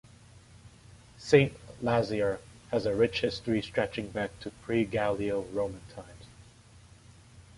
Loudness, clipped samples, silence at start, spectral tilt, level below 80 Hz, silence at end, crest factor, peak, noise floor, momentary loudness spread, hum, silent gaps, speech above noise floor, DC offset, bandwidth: -30 LUFS; under 0.1%; 0.35 s; -6 dB/octave; -56 dBFS; 0.15 s; 24 dB; -8 dBFS; -55 dBFS; 20 LU; none; none; 26 dB; under 0.1%; 11.5 kHz